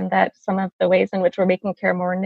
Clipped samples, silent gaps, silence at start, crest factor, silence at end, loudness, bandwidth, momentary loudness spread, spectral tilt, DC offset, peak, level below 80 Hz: under 0.1%; 0.73-0.79 s; 0 s; 18 dB; 0 s; -20 LUFS; 6.6 kHz; 4 LU; -8 dB/octave; under 0.1%; -2 dBFS; -62 dBFS